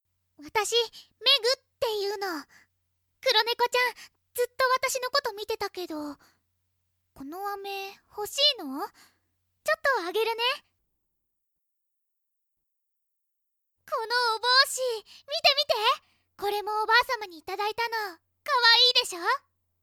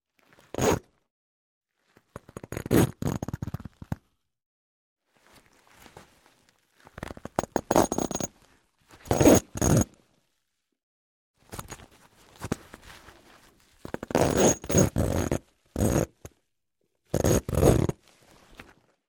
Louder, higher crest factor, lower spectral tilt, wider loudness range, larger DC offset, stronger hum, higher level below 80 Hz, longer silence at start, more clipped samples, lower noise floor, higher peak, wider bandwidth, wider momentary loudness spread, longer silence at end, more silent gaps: about the same, -25 LUFS vs -26 LUFS; about the same, 22 dB vs 24 dB; second, 0.5 dB/octave vs -5.5 dB/octave; second, 9 LU vs 18 LU; neither; neither; second, -70 dBFS vs -42 dBFS; second, 0.4 s vs 0.6 s; neither; about the same, -80 dBFS vs -79 dBFS; second, -8 dBFS vs -4 dBFS; first, over 20 kHz vs 17 kHz; second, 16 LU vs 21 LU; about the same, 0.45 s vs 0.45 s; second, none vs 1.10-1.61 s, 4.46-4.96 s, 10.83-11.34 s